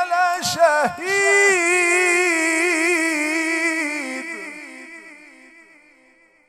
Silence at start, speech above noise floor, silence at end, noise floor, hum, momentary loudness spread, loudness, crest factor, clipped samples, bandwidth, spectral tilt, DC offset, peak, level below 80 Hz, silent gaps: 0 s; 38 dB; 1.3 s; -55 dBFS; none; 19 LU; -17 LUFS; 18 dB; under 0.1%; 16 kHz; -1.5 dB/octave; under 0.1%; -4 dBFS; -68 dBFS; none